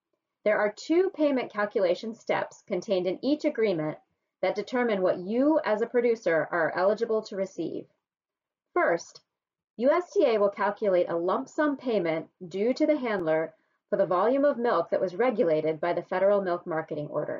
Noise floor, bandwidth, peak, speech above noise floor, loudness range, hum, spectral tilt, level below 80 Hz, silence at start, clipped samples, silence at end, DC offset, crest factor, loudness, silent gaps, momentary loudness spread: -90 dBFS; 7.4 kHz; -12 dBFS; 63 dB; 3 LU; none; -4.5 dB/octave; -76 dBFS; 0.45 s; under 0.1%; 0 s; under 0.1%; 14 dB; -27 LUFS; 9.70-9.74 s; 8 LU